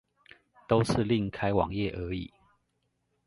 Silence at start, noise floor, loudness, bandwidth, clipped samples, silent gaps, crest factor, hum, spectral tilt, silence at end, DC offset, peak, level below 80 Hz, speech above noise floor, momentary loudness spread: 0.7 s; -77 dBFS; -29 LUFS; 11.5 kHz; under 0.1%; none; 22 dB; none; -7 dB/octave; 1 s; under 0.1%; -10 dBFS; -50 dBFS; 49 dB; 11 LU